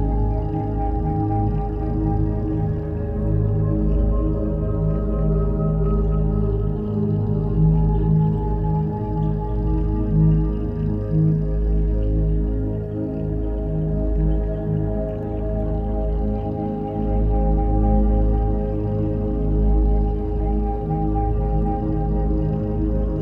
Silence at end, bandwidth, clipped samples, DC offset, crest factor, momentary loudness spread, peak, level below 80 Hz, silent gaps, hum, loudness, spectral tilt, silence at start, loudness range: 0 s; 3 kHz; under 0.1%; under 0.1%; 14 dB; 5 LU; -6 dBFS; -22 dBFS; none; none; -22 LUFS; -12.5 dB/octave; 0 s; 3 LU